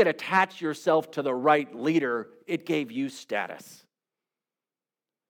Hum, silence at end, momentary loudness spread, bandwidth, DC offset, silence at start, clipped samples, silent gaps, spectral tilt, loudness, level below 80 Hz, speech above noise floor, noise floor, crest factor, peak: none; 1.55 s; 10 LU; 18 kHz; under 0.1%; 0 s; under 0.1%; none; -5.5 dB/octave; -27 LUFS; -90 dBFS; over 63 dB; under -90 dBFS; 20 dB; -8 dBFS